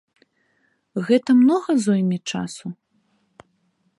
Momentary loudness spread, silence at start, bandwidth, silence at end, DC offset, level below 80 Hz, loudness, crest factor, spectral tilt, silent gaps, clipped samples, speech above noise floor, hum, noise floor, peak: 16 LU; 0.95 s; 11.5 kHz; 1.25 s; under 0.1%; -68 dBFS; -20 LUFS; 16 dB; -6 dB/octave; none; under 0.1%; 48 dB; none; -67 dBFS; -6 dBFS